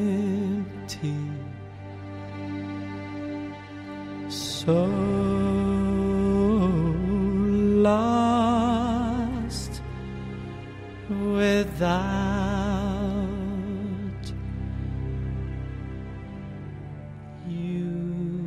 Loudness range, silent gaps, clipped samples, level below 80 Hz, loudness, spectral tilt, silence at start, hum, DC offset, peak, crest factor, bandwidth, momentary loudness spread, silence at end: 12 LU; none; under 0.1%; -40 dBFS; -26 LUFS; -7 dB/octave; 0 s; none; under 0.1%; -10 dBFS; 16 dB; 13.5 kHz; 16 LU; 0 s